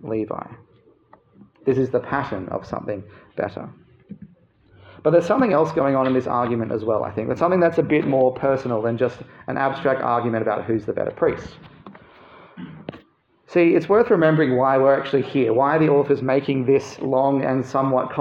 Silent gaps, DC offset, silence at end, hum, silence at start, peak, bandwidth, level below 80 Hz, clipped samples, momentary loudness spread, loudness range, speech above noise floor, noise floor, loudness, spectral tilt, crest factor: none; under 0.1%; 0 s; none; 0.05 s; -4 dBFS; 7.6 kHz; -58 dBFS; under 0.1%; 14 LU; 9 LU; 37 dB; -57 dBFS; -20 LUFS; -8 dB/octave; 16 dB